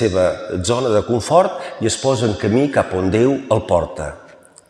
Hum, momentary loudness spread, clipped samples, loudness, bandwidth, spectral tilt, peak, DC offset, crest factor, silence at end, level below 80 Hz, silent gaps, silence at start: none; 7 LU; under 0.1%; -17 LUFS; 12.5 kHz; -5.5 dB/octave; -2 dBFS; under 0.1%; 16 dB; 0.45 s; -46 dBFS; none; 0 s